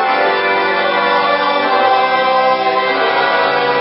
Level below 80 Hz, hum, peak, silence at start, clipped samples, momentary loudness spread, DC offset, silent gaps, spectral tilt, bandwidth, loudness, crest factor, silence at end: -62 dBFS; none; 0 dBFS; 0 s; under 0.1%; 2 LU; under 0.1%; none; -8.5 dB/octave; 5.8 kHz; -13 LUFS; 12 dB; 0 s